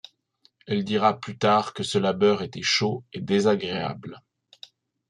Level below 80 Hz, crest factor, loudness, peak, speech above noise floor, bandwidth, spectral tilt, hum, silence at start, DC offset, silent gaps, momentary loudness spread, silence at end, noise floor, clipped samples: -68 dBFS; 20 dB; -24 LUFS; -4 dBFS; 41 dB; 11.5 kHz; -5 dB/octave; none; 0.7 s; under 0.1%; none; 10 LU; 0.9 s; -65 dBFS; under 0.1%